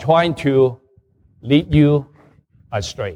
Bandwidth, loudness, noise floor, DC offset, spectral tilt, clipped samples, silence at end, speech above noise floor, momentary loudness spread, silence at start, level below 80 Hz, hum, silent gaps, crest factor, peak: 10 kHz; -17 LUFS; -55 dBFS; under 0.1%; -7 dB/octave; under 0.1%; 0 s; 39 dB; 12 LU; 0 s; -42 dBFS; none; none; 16 dB; -2 dBFS